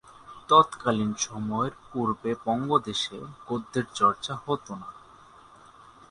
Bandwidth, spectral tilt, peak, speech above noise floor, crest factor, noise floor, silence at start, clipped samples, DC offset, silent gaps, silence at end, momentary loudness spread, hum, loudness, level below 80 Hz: 11 kHz; -4.5 dB/octave; -4 dBFS; 26 dB; 24 dB; -52 dBFS; 0.25 s; under 0.1%; under 0.1%; none; 1.1 s; 20 LU; none; -27 LUFS; -62 dBFS